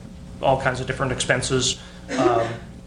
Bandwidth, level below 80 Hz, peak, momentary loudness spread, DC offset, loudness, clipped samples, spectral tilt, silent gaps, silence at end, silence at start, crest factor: 10.5 kHz; -42 dBFS; -4 dBFS; 9 LU; under 0.1%; -22 LUFS; under 0.1%; -4 dB/octave; none; 0 s; 0 s; 20 dB